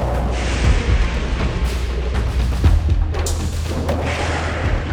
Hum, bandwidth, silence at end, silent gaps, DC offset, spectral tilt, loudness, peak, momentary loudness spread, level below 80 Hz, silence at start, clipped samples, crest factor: none; 13.5 kHz; 0 s; none; under 0.1%; -5.5 dB/octave; -20 LUFS; -2 dBFS; 5 LU; -20 dBFS; 0 s; under 0.1%; 14 dB